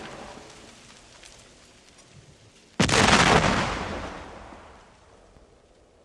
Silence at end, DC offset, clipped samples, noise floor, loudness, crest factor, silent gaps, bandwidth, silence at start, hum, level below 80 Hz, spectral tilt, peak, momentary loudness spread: 1.5 s; under 0.1%; under 0.1%; -57 dBFS; -21 LUFS; 24 dB; none; 13 kHz; 0 s; none; -44 dBFS; -3.5 dB/octave; -4 dBFS; 27 LU